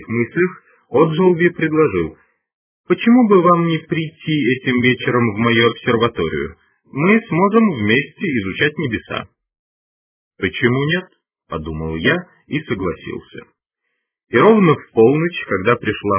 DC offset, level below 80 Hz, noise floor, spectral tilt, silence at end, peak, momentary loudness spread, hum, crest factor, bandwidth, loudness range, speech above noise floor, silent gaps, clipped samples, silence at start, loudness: under 0.1%; -46 dBFS; -74 dBFS; -10.5 dB/octave; 0 s; 0 dBFS; 13 LU; none; 16 dB; 3.5 kHz; 6 LU; 58 dB; 2.54-2.84 s, 9.59-10.31 s; under 0.1%; 0 s; -16 LUFS